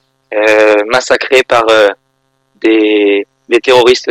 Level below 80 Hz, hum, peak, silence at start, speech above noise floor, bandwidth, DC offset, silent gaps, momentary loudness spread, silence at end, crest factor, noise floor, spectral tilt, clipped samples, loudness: -50 dBFS; none; 0 dBFS; 0.3 s; 52 dB; 14.5 kHz; under 0.1%; none; 8 LU; 0 s; 10 dB; -60 dBFS; -3 dB/octave; 0.3%; -9 LUFS